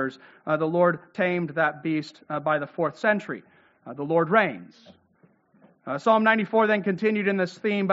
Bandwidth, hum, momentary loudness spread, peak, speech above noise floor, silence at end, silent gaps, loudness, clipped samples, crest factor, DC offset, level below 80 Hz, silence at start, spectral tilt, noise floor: 7.6 kHz; none; 14 LU; -4 dBFS; 37 dB; 0 s; none; -24 LUFS; under 0.1%; 20 dB; under 0.1%; -74 dBFS; 0 s; -4.5 dB/octave; -62 dBFS